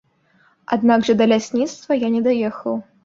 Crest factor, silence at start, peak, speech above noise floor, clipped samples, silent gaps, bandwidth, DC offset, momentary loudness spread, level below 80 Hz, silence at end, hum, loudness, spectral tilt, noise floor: 18 dB; 0.7 s; -2 dBFS; 40 dB; under 0.1%; none; 7.6 kHz; under 0.1%; 9 LU; -60 dBFS; 0.25 s; none; -19 LUFS; -5.5 dB/octave; -58 dBFS